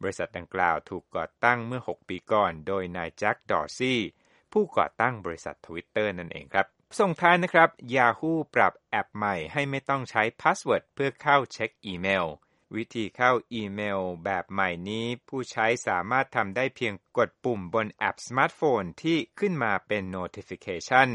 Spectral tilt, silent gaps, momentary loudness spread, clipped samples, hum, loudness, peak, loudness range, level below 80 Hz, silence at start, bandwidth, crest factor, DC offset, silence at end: -5 dB/octave; none; 11 LU; under 0.1%; none; -27 LUFS; -4 dBFS; 5 LU; -64 dBFS; 0 s; 11 kHz; 24 dB; under 0.1%; 0 s